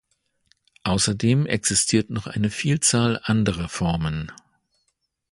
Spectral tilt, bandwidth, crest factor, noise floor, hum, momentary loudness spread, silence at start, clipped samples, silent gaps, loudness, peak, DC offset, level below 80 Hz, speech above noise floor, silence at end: -4 dB/octave; 12 kHz; 18 dB; -73 dBFS; none; 10 LU; 0.85 s; under 0.1%; none; -22 LUFS; -4 dBFS; under 0.1%; -44 dBFS; 51 dB; 1 s